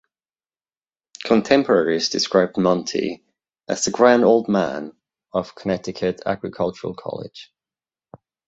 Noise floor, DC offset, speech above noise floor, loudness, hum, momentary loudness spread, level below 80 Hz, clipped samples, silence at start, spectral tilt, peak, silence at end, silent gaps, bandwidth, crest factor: under -90 dBFS; under 0.1%; over 70 dB; -20 LUFS; none; 16 LU; -58 dBFS; under 0.1%; 1.2 s; -4.5 dB/octave; -2 dBFS; 1.05 s; none; 8 kHz; 20 dB